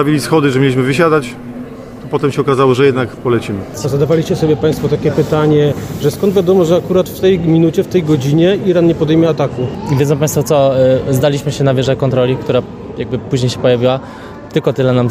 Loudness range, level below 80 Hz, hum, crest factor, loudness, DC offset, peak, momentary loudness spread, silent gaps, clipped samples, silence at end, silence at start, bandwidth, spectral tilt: 3 LU; -40 dBFS; none; 12 dB; -13 LUFS; under 0.1%; 0 dBFS; 9 LU; none; under 0.1%; 0 s; 0 s; 15.5 kHz; -6.5 dB/octave